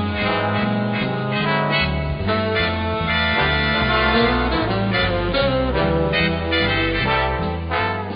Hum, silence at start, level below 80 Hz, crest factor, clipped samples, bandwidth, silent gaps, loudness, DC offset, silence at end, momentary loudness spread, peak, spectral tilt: none; 0 s; -30 dBFS; 16 dB; under 0.1%; 5.2 kHz; none; -19 LUFS; under 0.1%; 0 s; 5 LU; -4 dBFS; -11 dB/octave